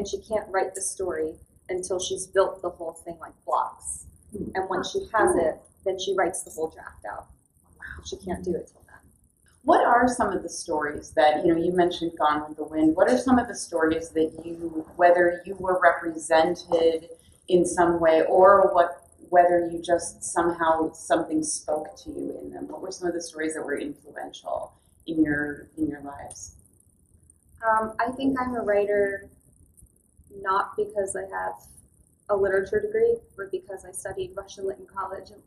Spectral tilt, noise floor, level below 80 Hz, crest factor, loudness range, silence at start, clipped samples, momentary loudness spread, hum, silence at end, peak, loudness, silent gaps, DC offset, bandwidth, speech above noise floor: -4 dB/octave; -61 dBFS; -54 dBFS; 22 dB; 10 LU; 0 s; under 0.1%; 17 LU; none; 0.2 s; -4 dBFS; -25 LUFS; none; under 0.1%; 14 kHz; 37 dB